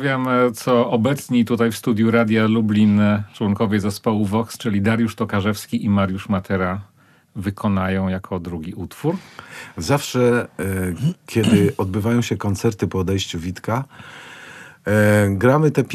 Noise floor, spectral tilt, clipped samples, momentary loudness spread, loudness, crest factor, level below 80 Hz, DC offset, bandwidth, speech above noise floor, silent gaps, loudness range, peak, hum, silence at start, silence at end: -40 dBFS; -6.5 dB/octave; under 0.1%; 14 LU; -19 LUFS; 18 dB; -52 dBFS; under 0.1%; 14 kHz; 21 dB; none; 6 LU; -2 dBFS; none; 0 s; 0 s